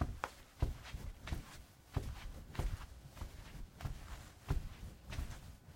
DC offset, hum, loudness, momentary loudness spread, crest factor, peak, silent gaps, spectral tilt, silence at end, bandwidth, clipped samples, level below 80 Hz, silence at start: under 0.1%; none; -47 LUFS; 11 LU; 24 dB; -20 dBFS; none; -5.5 dB/octave; 0 s; 16.5 kHz; under 0.1%; -46 dBFS; 0 s